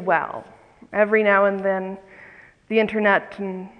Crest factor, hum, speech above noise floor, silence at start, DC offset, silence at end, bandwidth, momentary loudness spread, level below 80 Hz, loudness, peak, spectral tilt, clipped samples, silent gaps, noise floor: 18 dB; none; 26 dB; 0 s; under 0.1%; 0.1 s; 9 kHz; 16 LU; -62 dBFS; -20 LUFS; -4 dBFS; -7.5 dB/octave; under 0.1%; none; -47 dBFS